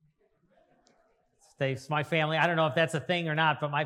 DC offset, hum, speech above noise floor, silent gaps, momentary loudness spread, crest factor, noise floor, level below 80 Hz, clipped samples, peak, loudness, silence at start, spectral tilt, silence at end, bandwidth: under 0.1%; none; 41 dB; none; 7 LU; 20 dB; -69 dBFS; -78 dBFS; under 0.1%; -10 dBFS; -28 LUFS; 1.6 s; -5.5 dB/octave; 0 s; 12.5 kHz